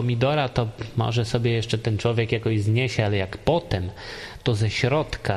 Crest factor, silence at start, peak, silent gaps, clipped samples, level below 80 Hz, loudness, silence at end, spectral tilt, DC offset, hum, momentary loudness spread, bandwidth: 18 dB; 0 s; -6 dBFS; none; under 0.1%; -44 dBFS; -24 LUFS; 0 s; -6.5 dB/octave; under 0.1%; none; 7 LU; 11.5 kHz